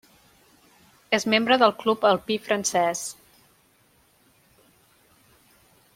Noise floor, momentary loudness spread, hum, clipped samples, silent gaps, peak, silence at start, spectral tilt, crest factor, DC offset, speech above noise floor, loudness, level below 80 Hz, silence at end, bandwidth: -62 dBFS; 7 LU; none; under 0.1%; none; -4 dBFS; 1.1 s; -3 dB/octave; 24 dB; under 0.1%; 39 dB; -22 LUFS; -68 dBFS; 2.85 s; 16.5 kHz